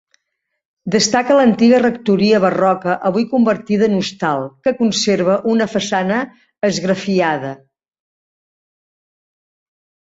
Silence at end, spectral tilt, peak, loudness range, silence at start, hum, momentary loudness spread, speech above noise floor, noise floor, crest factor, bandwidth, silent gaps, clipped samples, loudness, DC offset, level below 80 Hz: 2.5 s; -5 dB/octave; 0 dBFS; 8 LU; 0.85 s; none; 8 LU; 60 dB; -75 dBFS; 16 dB; 8 kHz; none; under 0.1%; -15 LUFS; under 0.1%; -58 dBFS